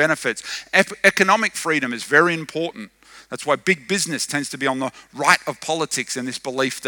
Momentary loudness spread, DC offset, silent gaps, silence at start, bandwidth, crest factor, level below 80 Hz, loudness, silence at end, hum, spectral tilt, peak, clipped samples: 12 LU; under 0.1%; none; 0 s; over 20 kHz; 22 dB; -66 dBFS; -20 LUFS; 0 s; none; -3 dB/octave; 0 dBFS; under 0.1%